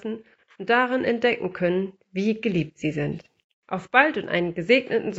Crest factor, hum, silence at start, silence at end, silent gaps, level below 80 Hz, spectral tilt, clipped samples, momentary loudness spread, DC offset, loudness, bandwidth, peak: 24 dB; none; 0.05 s; 0 s; 3.44-3.62 s; -60 dBFS; -3.5 dB/octave; under 0.1%; 14 LU; under 0.1%; -23 LUFS; 8 kHz; -2 dBFS